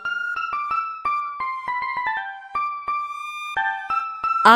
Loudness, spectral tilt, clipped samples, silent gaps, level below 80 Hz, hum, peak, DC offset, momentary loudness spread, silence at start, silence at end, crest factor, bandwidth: -25 LUFS; -3 dB/octave; under 0.1%; none; -62 dBFS; none; 0 dBFS; under 0.1%; 4 LU; 0 s; 0 s; 22 dB; 15 kHz